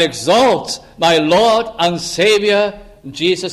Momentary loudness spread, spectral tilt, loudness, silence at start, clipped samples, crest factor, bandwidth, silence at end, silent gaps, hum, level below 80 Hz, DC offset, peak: 8 LU; -3.5 dB/octave; -14 LUFS; 0 s; under 0.1%; 14 dB; 15.5 kHz; 0 s; none; none; -48 dBFS; under 0.1%; -2 dBFS